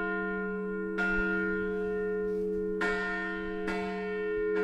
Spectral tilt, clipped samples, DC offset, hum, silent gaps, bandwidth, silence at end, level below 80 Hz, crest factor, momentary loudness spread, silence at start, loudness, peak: -7 dB/octave; under 0.1%; under 0.1%; none; none; 9 kHz; 0 s; -50 dBFS; 14 dB; 5 LU; 0 s; -32 LUFS; -18 dBFS